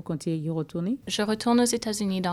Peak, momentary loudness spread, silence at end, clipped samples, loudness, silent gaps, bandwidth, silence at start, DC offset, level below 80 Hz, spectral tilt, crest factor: -10 dBFS; 8 LU; 0 s; under 0.1%; -26 LUFS; none; 14.5 kHz; 0.05 s; under 0.1%; -58 dBFS; -4.5 dB/octave; 16 dB